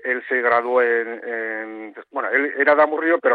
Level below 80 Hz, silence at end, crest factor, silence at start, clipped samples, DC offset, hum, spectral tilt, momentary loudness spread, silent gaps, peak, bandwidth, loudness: -72 dBFS; 0 s; 16 dB; 0.05 s; under 0.1%; under 0.1%; none; -7 dB/octave; 13 LU; none; -4 dBFS; 4.7 kHz; -19 LUFS